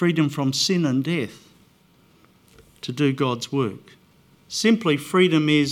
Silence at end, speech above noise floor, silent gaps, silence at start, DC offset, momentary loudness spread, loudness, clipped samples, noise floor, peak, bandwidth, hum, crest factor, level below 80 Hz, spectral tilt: 0 s; 36 dB; none; 0 s; under 0.1%; 13 LU; -22 LUFS; under 0.1%; -57 dBFS; -6 dBFS; 16.5 kHz; none; 18 dB; -66 dBFS; -5 dB/octave